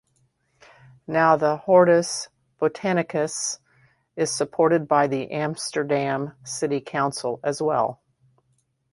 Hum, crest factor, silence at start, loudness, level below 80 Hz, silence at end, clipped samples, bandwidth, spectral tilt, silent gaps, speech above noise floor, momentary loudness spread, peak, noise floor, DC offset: none; 20 dB; 1.1 s; -23 LUFS; -68 dBFS; 1 s; under 0.1%; 11.5 kHz; -4.5 dB/octave; none; 47 dB; 10 LU; -4 dBFS; -69 dBFS; under 0.1%